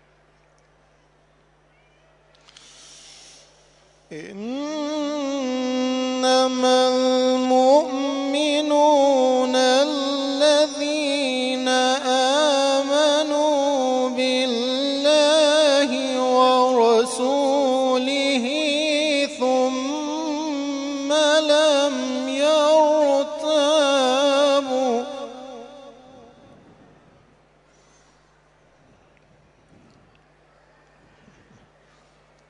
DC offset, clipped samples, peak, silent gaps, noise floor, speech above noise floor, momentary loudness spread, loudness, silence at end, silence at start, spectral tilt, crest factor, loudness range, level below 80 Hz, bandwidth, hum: under 0.1%; under 0.1%; -4 dBFS; none; -58 dBFS; 40 dB; 9 LU; -19 LUFS; 6.6 s; 4.1 s; -1.5 dB/octave; 16 dB; 8 LU; -66 dBFS; 11 kHz; none